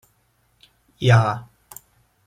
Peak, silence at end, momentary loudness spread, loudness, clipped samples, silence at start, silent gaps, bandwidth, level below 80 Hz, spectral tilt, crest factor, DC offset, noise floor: -4 dBFS; 0.85 s; 26 LU; -19 LUFS; under 0.1%; 1 s; none; 15 kHz; -58 dBFS; -6.5 dB/octave; 20 dB; under 0.1%; -64 dBFS